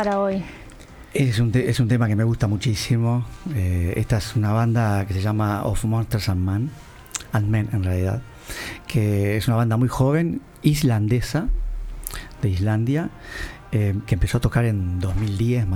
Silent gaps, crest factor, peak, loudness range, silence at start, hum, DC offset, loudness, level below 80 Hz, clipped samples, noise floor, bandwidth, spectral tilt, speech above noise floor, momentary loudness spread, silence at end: none; 16 dB; -4 dBFS; 3 LU; 0 s; none; under 0.1%; -22 LUFS; -34 dBFS; under 0.1%; -42 dBFS; 16.5 kHz; -6.5 dB/octave; 21 dB; 12 LU; 0 s